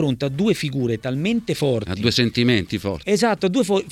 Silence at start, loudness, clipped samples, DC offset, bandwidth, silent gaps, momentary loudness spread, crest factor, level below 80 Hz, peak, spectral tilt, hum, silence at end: 0 s; -21 LUFS; under 0.1%; under 0.1%; 15.5 kHz; none; 5 LU; 16 dB; -48 dBFS; -4 dBFS; -5.5 dB/octave; none; 0 s